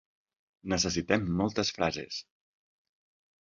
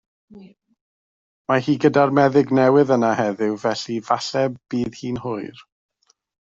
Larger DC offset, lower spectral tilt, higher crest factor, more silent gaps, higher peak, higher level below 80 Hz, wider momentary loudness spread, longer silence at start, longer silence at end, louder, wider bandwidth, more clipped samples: neither; second, -4 dB/octave vs -6.5 dB/octave; first, 24 dB vs 18 dB; second, none vs 0.81-1.45 s; second, -8 dBFS vs -2 dBFS; first, -54 dBFS vs -60 dBFS; about the same, 12 LU vs 12 LU; first, 0.65 s vs 0.35 s; first, 1.2 s vs 0.85 s; second, -30 LUFS vs -20 LUFS; about the same, 7.8 kHz vs 7.8 kHz; neither